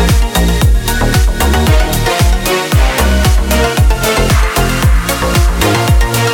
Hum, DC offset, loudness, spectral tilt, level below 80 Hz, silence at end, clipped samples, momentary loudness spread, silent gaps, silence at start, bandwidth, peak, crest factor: none; under 0.1%; -11 LUFS; -4.5 dB/octave; -12 dBFS; 0 s; under 0.1%; 2 LU; none; 0 s; 19 kHz; 0 dBFS; 10 dB